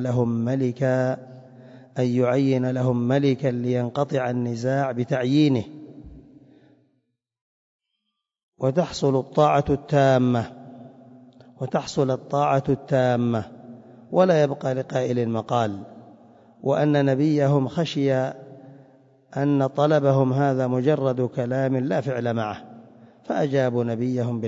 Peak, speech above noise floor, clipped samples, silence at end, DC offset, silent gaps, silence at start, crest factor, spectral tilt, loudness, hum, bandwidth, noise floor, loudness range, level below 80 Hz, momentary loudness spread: -6 dBFS; 58 dB; under 0.1%; 0 s; under 0.1%; 7.41-7.79 s, 8.43-8.52 s; 0 s; 18 dB; -7.5 dB/octave; -23 LUFS; none; 7.8 kHz; -80 dBFS; 3 LU; -58 dBFS; 10 LU